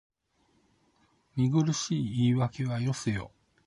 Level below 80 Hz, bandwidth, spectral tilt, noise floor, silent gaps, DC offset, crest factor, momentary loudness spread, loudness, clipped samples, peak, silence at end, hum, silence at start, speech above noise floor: -58 dBFS; 11.5 kHz; -6 dB/octave; -71 dBFS; none; under 0.1%; 16 dB; 10 LU; -29 LUFS; under 0.1%; -14 dBFS; 0.4 s; none; 1.35 s; 43 dB